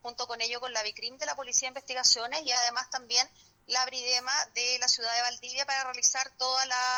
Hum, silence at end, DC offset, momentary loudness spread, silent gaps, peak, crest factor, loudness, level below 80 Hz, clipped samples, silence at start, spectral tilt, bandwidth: none; 0 s; under 0.1%; 9 LU; none; -10 dBFS; 20 dB; -28 LUFS; -74 dBFS; under 0.1%; 0.05 s; 2.5 dB/octave; over 20 kHz